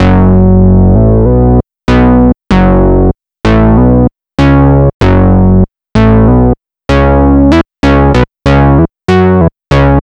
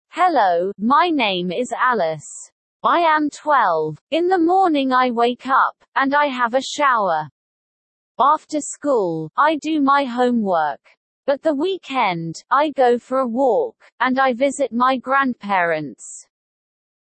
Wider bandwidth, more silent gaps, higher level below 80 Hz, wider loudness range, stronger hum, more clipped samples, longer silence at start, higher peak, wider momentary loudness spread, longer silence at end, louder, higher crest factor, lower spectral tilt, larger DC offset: about the same, 8.2 kHz vs 8.8 kHz; second, 4.94-5.00 s vs 2.52-2.80 s, 4.01-4.07 s, 5.88-5.92 s, 7.31-8.15 s, 10.97-11.23 s, 13.92-13.98 s; first, -14 dBFS vs -72 dBFS; about the same, 1 LU vs 3 LU; neither; neither; second, 0 s vs 0.15 s; first, 0 dBFS vs -4 dBFS; second, 5 LU vs 8 LU; second, 0 s vs 0.95 s; first, -7 LUFS vs -18 LUFS; second, 6 dB vs 14 dB; first, -9 dB/octave vs -4.5 dB/octave; first, 2% vs under 0.1%